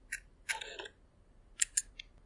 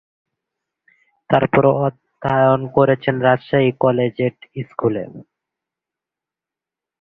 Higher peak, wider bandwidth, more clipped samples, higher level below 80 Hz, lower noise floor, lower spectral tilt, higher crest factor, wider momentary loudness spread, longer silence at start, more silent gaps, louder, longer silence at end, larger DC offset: second, -10 dBFS vs -2 dBFS; first, 11.5 kHz vs 4.8 kHz; neither; second, -62 dBFS vs -54 dBFS; second, -63 dBFS vs -88 dBFS; second, 1.5 dB/octave vs -10 dB/octave; first, 32 dB vs 18 dB; first, 18 LU vs 12 LU; second, 0.05 s vs 1.3 s; neither; second, -37 LUFS vs -17 LUFS; second, 0 s vs 1.8 s; neither